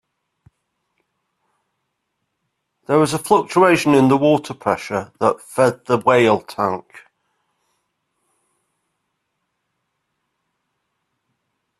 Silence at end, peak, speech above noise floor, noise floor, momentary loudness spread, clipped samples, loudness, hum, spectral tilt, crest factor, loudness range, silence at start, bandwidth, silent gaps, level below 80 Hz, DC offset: 5 s; 0 dBFS; 58 dB; -75 dBFS; 9 LU; under 0.1%; -17 LUFS; none; -5.5 dB/octave; 20 dB; 9 LU; 2.9 s; 13.5 kHz; none; -60 dBFS; under 0.1%